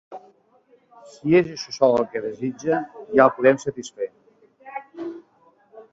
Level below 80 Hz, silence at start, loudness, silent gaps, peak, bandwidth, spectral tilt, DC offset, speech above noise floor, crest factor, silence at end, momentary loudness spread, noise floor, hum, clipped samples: -64 dBFS; 0.1 s; -22 LUFS; none; -2 dBFS; 8 kHz; -6 dB/octave; under 0.1%; 38 dB; 22 dB; 0.1 s; 20 LU; -59 dBFS; none; under 0.1%